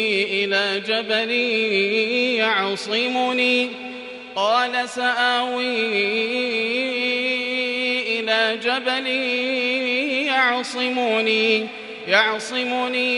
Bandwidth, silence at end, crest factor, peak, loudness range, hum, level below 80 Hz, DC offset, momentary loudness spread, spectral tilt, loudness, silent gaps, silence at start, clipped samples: 11.5 kHz; 0 s; 20 dB; -2 dBFS; 1 LU; none; -70 dBFS; under 0.1%; 4 LU; -3 dB/octave; -20 LUFS; none; 0 s; under 0.1%